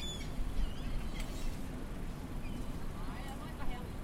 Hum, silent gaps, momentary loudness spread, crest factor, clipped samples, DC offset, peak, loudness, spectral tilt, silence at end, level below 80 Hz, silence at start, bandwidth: none; none; 3 LU; 16 dB; under 0.1%; under 0.1%; -22 dBFS; -43 LUFS; -5 dB/octave; 0 s; -40 dBFS; 0 s; 15.5 kHz